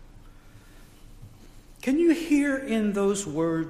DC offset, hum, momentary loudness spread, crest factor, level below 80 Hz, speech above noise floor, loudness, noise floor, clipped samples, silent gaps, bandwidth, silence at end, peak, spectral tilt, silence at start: under 0.1%; none; 5 LU; 16 dB; -50 dBFS; 25 dB; -25 LUFS; -49 dBFS; under 0.1%; none; 15 kHz; 0 s; -12 dBFS; -5.5 dB/octave; 0 s